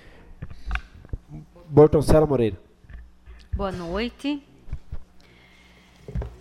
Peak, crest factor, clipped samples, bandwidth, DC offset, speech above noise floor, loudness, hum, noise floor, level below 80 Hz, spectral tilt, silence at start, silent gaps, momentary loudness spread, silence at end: -4 dBFS; 20 dB; under 0.1%; 13.5 kHz; under 0.1%; 33 dB; -22 LUFS; none; -52 dBFS; -36 dBFS; -7.5 dB/octave; 0.3 s; none; 27 LU; 0.05 s